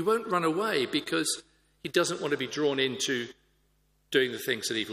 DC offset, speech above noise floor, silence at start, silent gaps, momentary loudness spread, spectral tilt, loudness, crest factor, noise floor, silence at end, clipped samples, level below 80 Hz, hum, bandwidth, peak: under 0.1%; 41 dB; 0 s; none; 4 LU; -3 dB/octave; -29 LUFS; 20 dB; -69 dBFS; 0 s; under 0.1%; -70 dBFS; none; 15.5 kHz; -10 dBFS